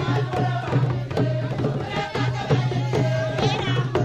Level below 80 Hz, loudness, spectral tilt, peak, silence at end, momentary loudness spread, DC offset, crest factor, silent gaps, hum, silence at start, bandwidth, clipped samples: -46 dBFS; -23 LUFS; -7 dB/octave; -8 dBFS; 0 s; 3 LU; under 0.1%; 14 dB; none; none; 0 s; 8.2 kHz; under 0.1%